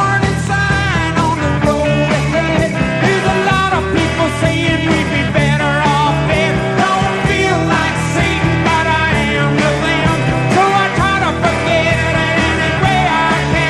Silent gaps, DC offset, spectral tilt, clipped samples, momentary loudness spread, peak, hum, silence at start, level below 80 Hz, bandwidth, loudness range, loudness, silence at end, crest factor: none; 0.1%; -5.5 dB/octave; under 0.1%; 2 LU; 0 dBFS; none; 0 s; -28 dBFS; 12.5 kHz; 1 LU; -13 LUFS; 0 s; 12 dB